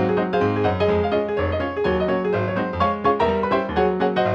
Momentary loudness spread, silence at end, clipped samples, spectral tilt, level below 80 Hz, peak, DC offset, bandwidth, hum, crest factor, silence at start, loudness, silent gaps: 3 LU; 0 s; under 0.1%; -8 dB/octave; -42 dBFS; -6 dBFS; under 0.1%; 7 kHz; none; 14 dB; 0 s; -21 LUFS; none